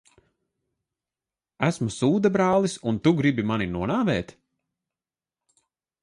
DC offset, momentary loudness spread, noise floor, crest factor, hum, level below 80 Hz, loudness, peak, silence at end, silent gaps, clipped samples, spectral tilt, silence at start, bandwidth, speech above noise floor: under 0.1%; 6 LU; under -90 dBFS; 18 dB; none; -54 dBFS; -24 LUFS; -8 dBFS; 1.8 s; none; under 0.1%; -6.5 dB/octave; 1.6 s; 11.5 kHz; over 67 dB